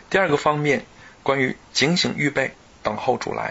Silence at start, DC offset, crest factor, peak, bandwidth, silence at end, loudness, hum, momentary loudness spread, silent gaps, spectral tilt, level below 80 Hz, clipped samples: 0.1 s; under 0.1%; 18 dB; -4 dBFS; 8 kHz; 0 s; -22 LUFS; none; 9 LU; none; -4.5 dB/octave; -54 dBFS; under 0.1%